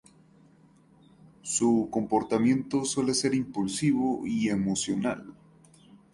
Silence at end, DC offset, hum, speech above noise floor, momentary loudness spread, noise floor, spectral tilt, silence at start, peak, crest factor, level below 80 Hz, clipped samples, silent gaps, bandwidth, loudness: 0.8 s; under 0.1%; none; 32 dB; 6 LU; -59 dBFS; -4.5 dB/octave; 1.45 s; -12 dBFS; 16 dB; -62 dBFS; under 0.1%; none; 11.5 kHz; -27 LUFS